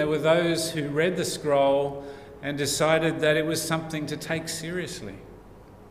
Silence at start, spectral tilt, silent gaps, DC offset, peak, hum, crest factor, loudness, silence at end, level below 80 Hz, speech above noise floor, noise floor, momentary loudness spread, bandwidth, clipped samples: 0 s; -4.5 dB/octave; none; under 0.1%; -8 dBFS; none; 18 dB; -25 LUFS; 0 s; -54 dBFS; 22 dB; -48 dBFS; 14 LU; 16 kHz; under 0.1%